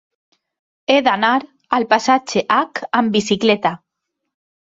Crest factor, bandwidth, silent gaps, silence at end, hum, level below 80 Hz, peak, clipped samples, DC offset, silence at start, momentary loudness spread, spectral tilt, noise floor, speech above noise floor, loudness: 18 dB; 8 kHz; none; 0.9 s; none; -60 dBFS; -2 dBFS; under 0.1%; under 0.1%; 0.9 s; 6 LU; -4 dB/octave; -78 dBFS; 61 dB; -17 LUFS